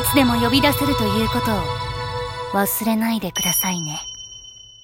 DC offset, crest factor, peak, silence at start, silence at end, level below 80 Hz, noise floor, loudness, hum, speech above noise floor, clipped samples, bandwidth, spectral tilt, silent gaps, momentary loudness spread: under 0.1%; 18 dB; -2 dBFS; 0 s; 0.2 s; -38 dBFS; -41 dBFS; -20 LUFS; none; 22 dB; under 0.1%; 17 kHz; -4 dB/octave; none; 15 LU